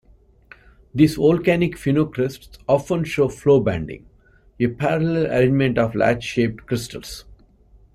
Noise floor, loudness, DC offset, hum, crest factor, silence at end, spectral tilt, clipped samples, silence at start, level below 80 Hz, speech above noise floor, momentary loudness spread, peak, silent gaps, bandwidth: -53 dBFS; -20 LUFS; under 0.1%; none; 18 dB; 0.6 s; -7 dB/octave; under 0.1%; 0.95 s; -46 dBFS; 33 dB; 15 LU; -2 dBFS; none; 15 kHz